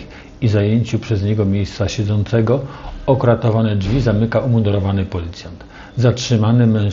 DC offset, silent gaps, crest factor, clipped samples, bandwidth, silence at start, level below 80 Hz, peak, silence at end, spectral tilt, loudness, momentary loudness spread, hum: under 0.1%; none; 16 dB; under 0.1%; 7.4 kHz; 0 s; -36 dBFS; 0 dBFS; 0 s; -7.5 dB/octave; -17 LUFS; 13 LU; none